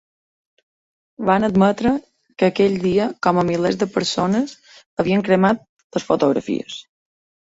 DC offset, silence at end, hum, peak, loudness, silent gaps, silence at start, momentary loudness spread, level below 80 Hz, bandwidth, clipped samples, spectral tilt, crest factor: under 0.1%; 0.65 s; none; -2 dBFS; -19 LUFS; 4.86-4.97 s, 5.69-5.77 s, 5.84-5.90 s; 1.2 s; 11 LU; -52 dBFS; 8 kHz; under 0.1%; -6 dB/octave; 18 dB